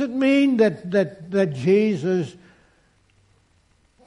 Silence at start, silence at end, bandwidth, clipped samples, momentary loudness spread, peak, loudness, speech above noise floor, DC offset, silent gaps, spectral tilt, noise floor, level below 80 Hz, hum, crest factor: 0 s; 1.75 s; 10.5 kHz; under 0.1%; 7 LU; -6 dBFS; -20 LUFS; 41 dB; under 0.1%; none; -7.5 dB/octave; -61 dBFS; -64 dBFS; none; 16 dB